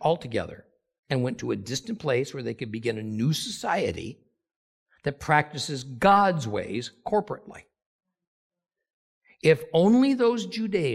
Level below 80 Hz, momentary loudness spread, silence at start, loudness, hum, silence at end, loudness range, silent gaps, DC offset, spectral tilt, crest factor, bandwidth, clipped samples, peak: -60 dBFS; 13 LU; 0 s; -26 LUFS; none; 0 s; 4 LU; 0.99-1.03 s, 4.56-4.86 s, 7.86-7.99 s, 8.27-8.50 s, 8.93-9.21 s; under 0.1%; -5.5 dB/octave; 22 dB; 15 kHz; under 0.1%; -6 dBFS